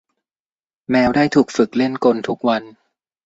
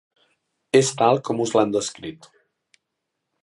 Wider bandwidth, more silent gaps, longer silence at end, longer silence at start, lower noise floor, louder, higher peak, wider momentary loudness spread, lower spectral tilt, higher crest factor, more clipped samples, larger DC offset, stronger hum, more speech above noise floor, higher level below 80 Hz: second, 8 kHz vs 11.5 kHz; neither; second, 0.55 s vs 1.3 s; first, 0.9 s vs 0.75 s; first, under -90 dBFS vs -80 dBFS; first, -17 LUFS vs -20 LUFS; about the same, -2 dBFS vs -2 dBFS; second, 6 LU vs 14 LU; first, -6 dB/octave vs -4.5 dB/octave; second, 16 dB vs 22 dB; neither; neither; neither; first, over 74 dB vs 59 dB; first, -54 dBFS vs -66 dBFS